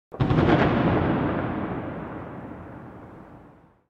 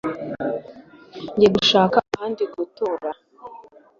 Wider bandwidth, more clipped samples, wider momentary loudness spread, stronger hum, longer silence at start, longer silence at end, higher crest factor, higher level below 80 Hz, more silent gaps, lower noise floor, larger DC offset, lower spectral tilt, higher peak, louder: about the same, 7 kHz vs 7.4 kHz; neither; second, 22 LU vs 25 LU; neither; about the same, 0.1 s vs 0.05 s; about the same, 0.4 s vs 0.4 s; about the same, 18 dB vs 20 dB; first, -42 dBFS vs -56 dBFS; neither; first, -52 dBFS vs -45 dBFS; neither; first, -9 dB/octave vs -5 dB/octave; second, -8 dBFS vs -2 dBFS; second, -24 LUFS vs -21 LUFS